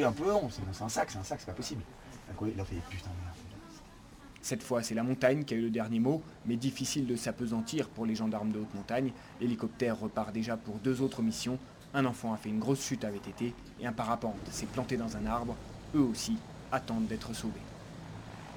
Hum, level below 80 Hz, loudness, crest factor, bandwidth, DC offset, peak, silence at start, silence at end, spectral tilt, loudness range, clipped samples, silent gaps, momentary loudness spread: none; -56 dBFS; -35 LUFS; 22 dB; over 20 kHz; under 0.1%; -12 dBFS; 0 s; 0 s; -5.5 dB/octave; 6 LU; under 0.1%; none; 14 LU